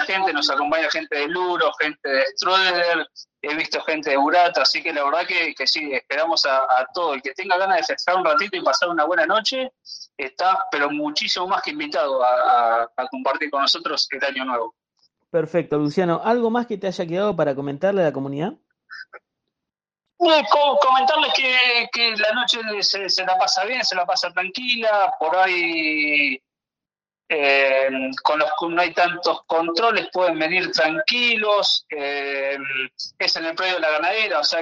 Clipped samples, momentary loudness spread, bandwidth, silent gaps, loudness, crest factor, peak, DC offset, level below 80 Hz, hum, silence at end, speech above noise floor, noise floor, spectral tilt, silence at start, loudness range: under 0.1%; 8 LU; 9.6 kHz; none; -20 LUFS; 18 dB; -2 dBFS; under 0.1%; -70 dBFS; none; 0 s; over 69 dB; under -90 dBFS; -3 dB/octave; 0 s; 5 LU